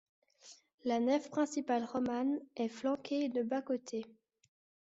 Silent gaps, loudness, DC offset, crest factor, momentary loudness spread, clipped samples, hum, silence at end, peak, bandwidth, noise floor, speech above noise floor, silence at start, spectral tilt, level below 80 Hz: 0.74-0.78 s; -36 LUFS; under 0.1%; 16 dB; 8 LU; under 0.1%; none; 0.75 s; -20 dBFS; 8 kHz; -61 dBFS; 26 dB; 0.45 s; -4.5 dB/octave; -80 dBFS